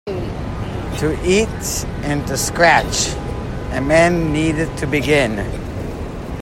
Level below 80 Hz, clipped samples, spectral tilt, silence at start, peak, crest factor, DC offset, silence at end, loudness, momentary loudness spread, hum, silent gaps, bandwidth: -30 dBFS; under 0.1%; -4.5 dB/octave; 0.05 s; 0 dBFS; 18 dB; under 0.1%; 0 s; -18 LUFS; 13 LU; none; none; 16.5 kHz